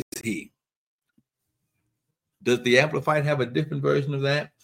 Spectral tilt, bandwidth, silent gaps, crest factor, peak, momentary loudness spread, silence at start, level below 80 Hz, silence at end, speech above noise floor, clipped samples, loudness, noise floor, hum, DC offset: -5.5 dB/octave; 16.5 kHz; 0.76-0.99 s; 26 dB; -2 dBFS; 11 LU; 0.15 s; -68 dBFS; 0.15 s; 57 dB; under 0.1%; -24 LUFS; -80 dBFS; none; under 0.1%